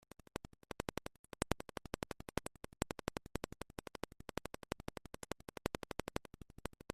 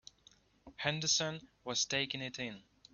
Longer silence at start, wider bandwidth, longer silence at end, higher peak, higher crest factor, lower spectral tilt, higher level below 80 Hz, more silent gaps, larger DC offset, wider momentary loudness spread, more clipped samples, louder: second, 0.35 s vs 0.65 s; first, 15 kHz vs 7.2 kHz; second, 0 s vs 0.35 s; first, -12 dBFS vs -16 dBFS; first, 34 dB vs 24 dB; first, -4.5 dB/octave vs -2 dB/octave; first, -58 dBFS vs -70 dBFS; first, 1.19-1.24 s vs none; neither; second, 9 LU vs 13 LU; neither; second, -47 LUFS vs -35 LUFS